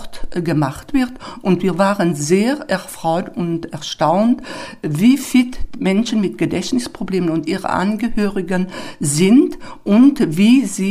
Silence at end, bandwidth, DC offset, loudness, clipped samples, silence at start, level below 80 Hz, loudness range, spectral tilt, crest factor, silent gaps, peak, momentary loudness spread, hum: 0 s; 15.5 kHz; under 0.1%; -17 LUFS; under 0.1%; 0 s; -38 dBFS; 3 LU; -5.5 dB/octave; 14 dB; none; -2 dBFS; 11 LU; none